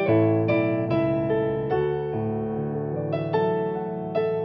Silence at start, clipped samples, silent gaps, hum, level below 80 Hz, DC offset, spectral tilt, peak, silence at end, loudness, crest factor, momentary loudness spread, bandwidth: 0 s; under 0.1%; none; none; -52 dBFS; under 0.1%; -7.5 dB/octave; -10 dBFS; 0 s; -25 LUFS; 14 dB; 7 LU; 5.8 kHz